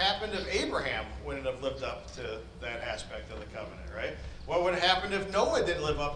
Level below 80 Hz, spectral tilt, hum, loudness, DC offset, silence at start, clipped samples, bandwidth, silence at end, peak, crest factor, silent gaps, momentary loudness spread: -46 dBFS; -4 dB/octave; none; -32 LUFS; under 0.1%; 0 s; under 0.1%; 10.5 kHz; 0 s; -10 dBFS; 24 dB; none; 15 LU